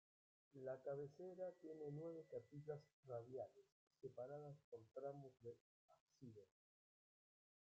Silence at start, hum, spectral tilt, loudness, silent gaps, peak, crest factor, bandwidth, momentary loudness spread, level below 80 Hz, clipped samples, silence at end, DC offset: 0.55 s; none; -8.5 dB/octave; -56 LUFS; 2.93-3.03 s, 3.72-3.87 s, 4.64-4.72 s, 5.60-5.88 s, 6.00-6.06 s; -40 dBFS; 18 dB; 7.6 kHz; 11 LU; under -90 dBFS; under 0.1%; 1.25 s; under 0.1%